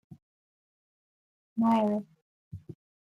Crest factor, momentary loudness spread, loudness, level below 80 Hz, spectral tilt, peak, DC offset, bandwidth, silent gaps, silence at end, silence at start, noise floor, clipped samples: 18 dB; 23 LU; -28 LUFS; -72 dBFS; -8.5 dB/octave; -16 dBFS; under 0.1%; 6.6 kHz; 0.22-1.56 s, 2.22-2.51 s; 0.3 s; 0.1 s; under -90 dBFS; under 0.1%